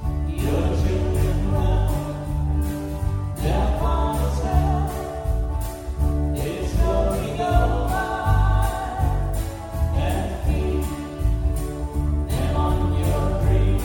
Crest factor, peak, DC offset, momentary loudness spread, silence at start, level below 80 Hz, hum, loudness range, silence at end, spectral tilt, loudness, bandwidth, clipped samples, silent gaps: 16 dB; -6 dBFS; under 0.1%; 6 LU; 0 s; -24 dBFS; none; 2 LU; 0 s; -7 dB/octave; -23 LUFS; 17.5 kHz; under 0.1%; none